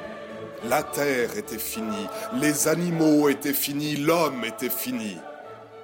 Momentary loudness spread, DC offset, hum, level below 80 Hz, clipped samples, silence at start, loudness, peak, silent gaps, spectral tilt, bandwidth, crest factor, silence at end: 16 LU; under 0.1%; none; -62 dBFS; under 0.1%; 0 s; -25 LUFS; -10 dBFS; none; -4 dB/octave; 17 kHz; 16 dB; 0 s